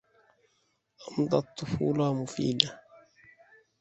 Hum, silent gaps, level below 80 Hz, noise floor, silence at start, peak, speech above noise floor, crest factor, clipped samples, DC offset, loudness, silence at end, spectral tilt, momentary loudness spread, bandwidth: none; none; -60 dBFS; -74 dBFS; 1 s; -2 dBFS; 45 dB; 30 dB; under 0.1%; under 0.1%; -29 LUFS; 0.8 s; -5.5 dB/octave; 12 LU; 8.4 kHz